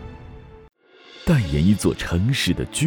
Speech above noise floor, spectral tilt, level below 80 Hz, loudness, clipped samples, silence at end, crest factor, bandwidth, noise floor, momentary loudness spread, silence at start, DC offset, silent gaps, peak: 27 dB; -5.5 dB/octave; -36 dBFS; -21 LUFS; under 0.1%; 0 s; 16 dB; over 20 kHz; -47 dBFS; 14 LU; 0 s; under 0.1%; none; -6 dBFS